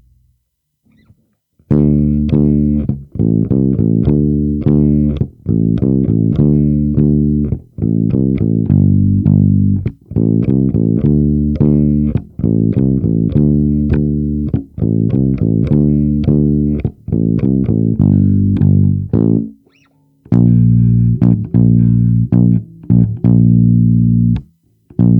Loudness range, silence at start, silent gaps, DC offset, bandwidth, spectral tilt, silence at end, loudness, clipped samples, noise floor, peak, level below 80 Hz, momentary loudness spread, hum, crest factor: 3 LU; 1.7 s; none; under 0.1%; 3.7 kHz; -13.5 dB/octave; 0 s; -13 LUFS; under 0.1%; -67 dBFS; 0 dBFS; -28 dBFS; 6 LU; none; 12 dB